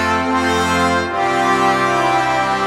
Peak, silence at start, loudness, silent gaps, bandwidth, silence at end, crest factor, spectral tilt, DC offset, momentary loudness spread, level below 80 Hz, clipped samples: -2 dBFS; 0 s; -15 LUFS; none; 16 kHz; 0 s; 14 dB; -4 dB/octave; under 0.1%; 2 LU; -42 dBFS; under 0.1%